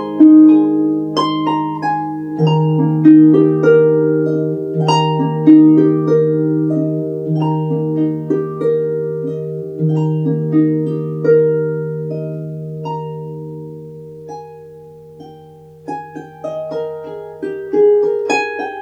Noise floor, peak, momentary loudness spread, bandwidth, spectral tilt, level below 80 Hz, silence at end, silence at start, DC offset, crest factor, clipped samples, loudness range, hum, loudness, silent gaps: -39 dBFS; 0 dBFS; 20 LU; 7.2 kHz; -8.5 dB/octave; -62 dBFS; 0 s; 0 s; under 0.1%; 14 dB; under 0.1%; 17 LU; none; -14 LUFS; none